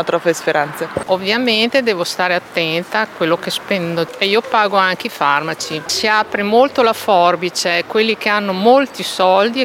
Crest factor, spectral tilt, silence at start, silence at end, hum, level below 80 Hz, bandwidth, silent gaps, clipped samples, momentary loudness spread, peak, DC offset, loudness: 14 dB; -3.5 dB/octave; 0 s; 0 s; none; -58 dBFS; 17 kHz; none; under 0.1%; 6 LU; 0 dBFS; under 0.1%; -15 LUFS